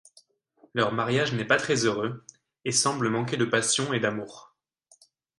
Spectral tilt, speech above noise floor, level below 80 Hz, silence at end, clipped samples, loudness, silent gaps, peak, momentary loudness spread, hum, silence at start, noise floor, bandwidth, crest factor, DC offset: -3.5 dB/octave; 38 dB; -66 dBFS; 1 s; under 0.1%; -26 LUFS; none; -6 dBFS; 11 LU; none; 0.75 s; -64 dBFS; 11.5 kHz; 22 dB; under 0.1%